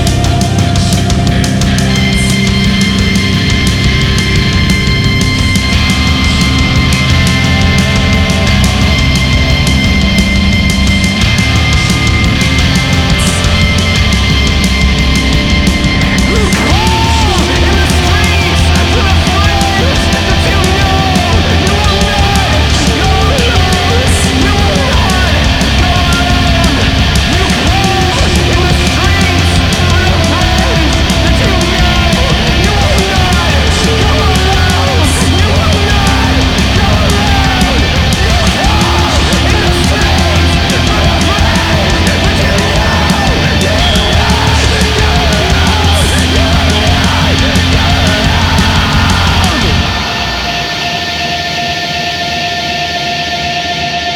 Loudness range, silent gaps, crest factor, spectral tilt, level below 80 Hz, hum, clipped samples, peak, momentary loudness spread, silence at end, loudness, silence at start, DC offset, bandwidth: 1 LU; none; 8 dB; -4.5 dB/octave; -14 dBFS; none; under 0.1%; 0 dBFS; 2 LU; 0 s; -9 LUFS; 0 s; under 0.1%; 16.5 kHz